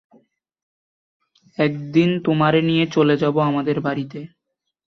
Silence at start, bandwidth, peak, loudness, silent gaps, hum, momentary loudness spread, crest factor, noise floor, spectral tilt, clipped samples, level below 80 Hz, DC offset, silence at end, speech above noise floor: 1.6 s; 6.4 kHz; -4 dBFS; -19 LUFS; none; none; 11 LU; 16 dB; -79 dBFS; -7.5 dB/octave; under 0.1%; -62 dBFS; under 0.1%; 0.6 s; 60 dB